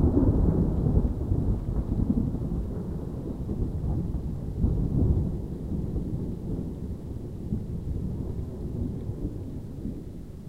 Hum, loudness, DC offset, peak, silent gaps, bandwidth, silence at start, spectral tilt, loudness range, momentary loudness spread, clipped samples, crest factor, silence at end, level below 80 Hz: none; -30 LUFS; 0.3%; -10 dBFS; none; 9.8 kHz; 0 s; -11 dB/octave; 6 LU; 12 LU; under 0.1%; 18 dB; 0 s; -32 dBFS